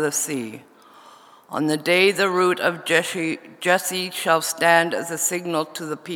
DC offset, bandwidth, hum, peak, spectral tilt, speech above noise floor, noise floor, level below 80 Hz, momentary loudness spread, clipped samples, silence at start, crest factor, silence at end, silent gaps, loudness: under 0.1%; over 20 kHz; none; 0 dBFS; -3 dB/octave; 27 dB; -48 dBFS; -82 dBFS; 11 LU; under 0.1%; 0 s; 22 dB; 0 s; none; -21 LUFS